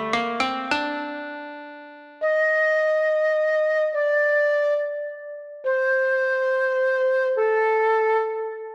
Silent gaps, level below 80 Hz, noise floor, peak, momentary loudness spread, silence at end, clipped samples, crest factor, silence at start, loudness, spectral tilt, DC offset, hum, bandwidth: none; -68 dBFS; -42 dBFS; -6 dBFS; 14 LU; 0 s; under 0.1%; 16 dB; 0 s; -22 LUFS; -3.5 dB/octave; under 0.1%; none; 9.6 kHz